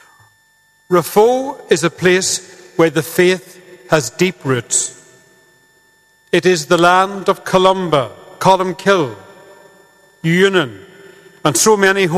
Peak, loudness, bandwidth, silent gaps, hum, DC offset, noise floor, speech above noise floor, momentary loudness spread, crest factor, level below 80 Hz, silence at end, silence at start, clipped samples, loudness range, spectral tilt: 0 dBFS; -14 LUFS; 14.5 kHz; none; 50 Hz at -55 dBFS; under 0.1%; -55 dBFS; 41 dB; 8 LU; 16 dB; -54 dBFS; 0 s; 0.9 s; 0.1%; 3 LU; -4 dB/octave